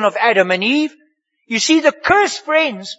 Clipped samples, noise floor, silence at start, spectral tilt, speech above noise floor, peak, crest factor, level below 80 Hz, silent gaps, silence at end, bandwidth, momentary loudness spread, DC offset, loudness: under 0.1%; -60 dBFS; 0 s; -3 dB/octave; 45 dB; 0 dBFS; 16 dB; -54 dBFS; none; 0.05 s; 8 kHz; 5 LU; under 0.1%; -15 LUFS